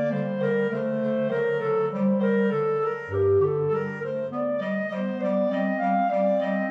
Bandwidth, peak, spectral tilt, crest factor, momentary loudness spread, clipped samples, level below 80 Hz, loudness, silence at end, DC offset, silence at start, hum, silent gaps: 6.2 kHz; -12 dBFS; -9 dB/octave; 12 dB; 5 LU; under 0.1%; -78 dBFS; -25 LUFS; 0 s; under 0.1%; 0 s; none; none